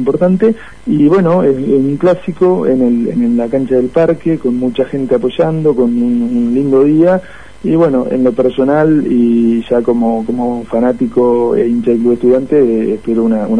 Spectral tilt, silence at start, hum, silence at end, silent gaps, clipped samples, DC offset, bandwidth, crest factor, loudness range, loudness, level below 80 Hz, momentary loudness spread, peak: -9 dB/octave; 0 s; none; 0 s; none; under 0.1%; 2%; 9.8 kHz; 10 dB; 1 LU; -12 LUFS; -42 dBFS; 5 LU; 0 dBFS